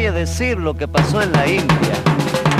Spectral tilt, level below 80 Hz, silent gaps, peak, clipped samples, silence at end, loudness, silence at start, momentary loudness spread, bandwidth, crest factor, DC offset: -5.5 dB/octave; -30 dBFS; none; 0 dBFS; under 0.1%; 0 s; -17 LUFS; 0 s; 4 LU; 15.5 kHz; 16 dB; under 0.1%